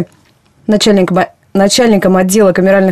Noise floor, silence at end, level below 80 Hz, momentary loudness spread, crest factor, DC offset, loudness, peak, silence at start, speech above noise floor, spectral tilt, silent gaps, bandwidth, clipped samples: -49 dBFS; 0 s; -44 dBFS; 7 LU; 10 dB; under 0.1%; -10 LUFS; 0 dBFS; 0 s; 40 dB; -5 dB/octave; none; 14 kHz; under 0.1%